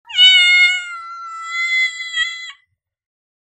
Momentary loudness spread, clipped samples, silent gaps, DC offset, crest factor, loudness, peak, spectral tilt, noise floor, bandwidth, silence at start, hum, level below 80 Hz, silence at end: 22 LU; under 0.1%; none; under 0.1%; 16 dB; -12 LUFS; 0 dBFS; 6.5 dB/octave; -64 dBFS; 15 kHz; 0.1 s; none; -70 dBFS; 0.95 s